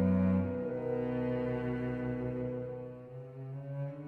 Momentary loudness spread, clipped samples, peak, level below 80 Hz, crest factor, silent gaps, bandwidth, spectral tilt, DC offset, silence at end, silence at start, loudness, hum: 14 LU; under 0.1%; -18 dBFS; -58 dBFS; 16 dB; none; 4.4 kHz; -11 dB/octave; under 0.1%; 0 s; 0 s; -35 LUFS; none